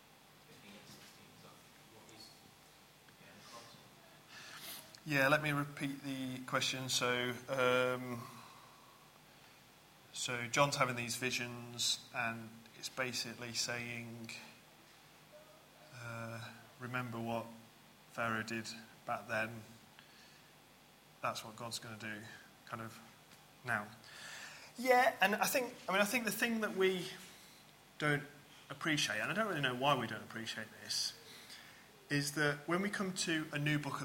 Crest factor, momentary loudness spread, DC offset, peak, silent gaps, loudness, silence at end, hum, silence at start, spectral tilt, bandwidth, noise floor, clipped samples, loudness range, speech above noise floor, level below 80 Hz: 26 dB; 24 LU; under 0.1%; -14 dBFS; none; -37 LUFS; 0 s; none; 0.35 s; -3.5 dB/octave; 16.5 kHz; -63 dBFS; under 0.1%; 12 LU; 25 dB; -76 dBFS